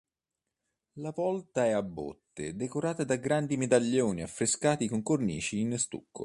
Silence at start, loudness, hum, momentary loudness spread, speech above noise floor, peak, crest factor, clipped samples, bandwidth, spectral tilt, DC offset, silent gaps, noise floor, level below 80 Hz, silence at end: 0.95 s; -30 LUFS; none; 13 LU; 58 dB; -12 dBFS; 20 dB; under 0.1%; 11.5 kHz; -5 dB/octave; under 0.1%; none; -89 dBFS; -62 dBFS; 0 s